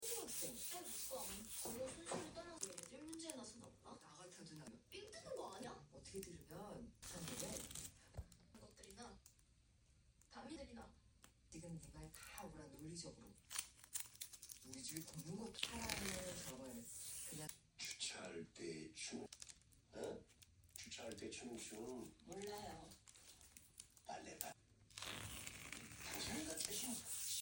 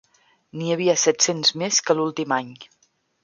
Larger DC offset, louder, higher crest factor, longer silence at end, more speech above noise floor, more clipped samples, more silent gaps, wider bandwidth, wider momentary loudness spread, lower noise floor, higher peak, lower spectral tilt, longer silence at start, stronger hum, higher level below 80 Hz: neither; second, -51 LUFS vs -20 LUFS; first, 32 dB vs 20 dB; second, 0 s vs 0.6 s; second, 24 dB vs 33 dB; neither; neither; first, 17 kHz vs 10.5 kHz; first, 16 LU vs 12 LU; first, -74 dBFS vs -54 dBFS; second, -20 dBFS vs -4 dBFS; about the same, -2.5 dB/octave vs -2.5 dB/octave; second, 0 s vs 0.55 s; neither; about the same, -70 dBFS vs -72 dBFS